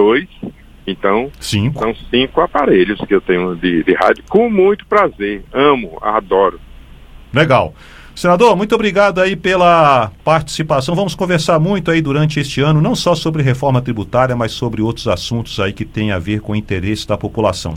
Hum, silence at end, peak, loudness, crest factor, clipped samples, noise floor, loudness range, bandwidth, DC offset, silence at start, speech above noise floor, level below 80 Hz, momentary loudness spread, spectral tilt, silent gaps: none; 0 s; 0 dBFS; -14 LUFS; 14 dB; under 0.1%; -37 dBFS; 4 LU; 15.5 kHz; under 0.1%; 0 s; 23 dB; -38 dBFS; 8 LU; -6 dB/octave; none